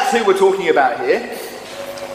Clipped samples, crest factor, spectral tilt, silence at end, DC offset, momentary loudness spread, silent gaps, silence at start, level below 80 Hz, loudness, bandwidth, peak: under 0.1%; 16 dB; -3.5 dB/octave; 0 s; under 0.1%; 15 LU; none; 0 s; -58 dBFS; -15 LUFS; 15.5 kHz; 0 dBFS